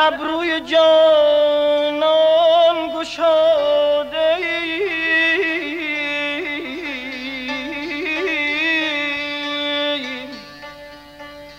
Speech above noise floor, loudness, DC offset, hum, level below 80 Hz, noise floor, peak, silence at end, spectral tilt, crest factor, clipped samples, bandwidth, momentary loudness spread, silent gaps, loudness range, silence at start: 24 dB; -17 LUFS; under 0.1%; none; -54 dBFS; -39 dBFS; -6 dBFS; 0 s; -3 dB/octave; 14 dB; under 0.1%; 9.4 kHz; 13 LU; none; 6 LU; 0 s